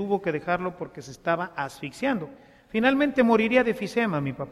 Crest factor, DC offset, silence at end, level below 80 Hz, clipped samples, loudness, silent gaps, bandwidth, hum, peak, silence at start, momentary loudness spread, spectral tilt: 18 dB; under 0.1%; 0 s; -58 dBFS; under 0.1%; -25 LUFS; none; 14 kHz; none; -8 dBFS; 0 s; 13 LU; -6 dB/octave